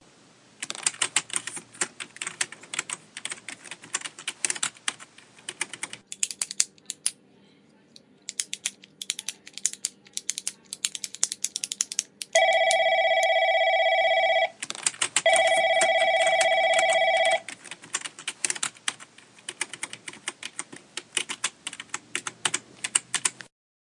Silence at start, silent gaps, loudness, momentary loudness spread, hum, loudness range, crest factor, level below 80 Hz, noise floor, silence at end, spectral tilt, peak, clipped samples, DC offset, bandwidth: 0.6 s; none; -26 LUFS; 16 LU; none; 11 LU; 28 dB; -84 dBFS; -58 dBFS; 0.5 s; 1 dB/octave; 0 dBFS; under 0.1%; under 0.1%; 11.5 kHz